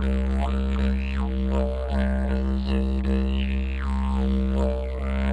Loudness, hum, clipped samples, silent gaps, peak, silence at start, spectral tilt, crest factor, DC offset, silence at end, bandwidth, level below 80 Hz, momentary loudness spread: -26 LUFS; none; under 0.1%; none; -12 dBFS; 0 s; -8.5 dB/octave; 12 dB; under 0.1%; 0 s; 4.9 kHz; -24 dBFS; 3 LU